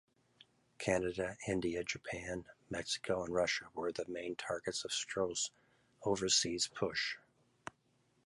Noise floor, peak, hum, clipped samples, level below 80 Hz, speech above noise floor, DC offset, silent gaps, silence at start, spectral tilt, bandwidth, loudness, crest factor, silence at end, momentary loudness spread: -75 dBFS; -18 dBFS; none; under 0.1%; -64 dBFS; 37 dB; under 0.1%; none; 0.8 s; -2.5 dB/octave; 11.5 kHz; -37 LUFS; 20 dB; 1.1 s; 12 LU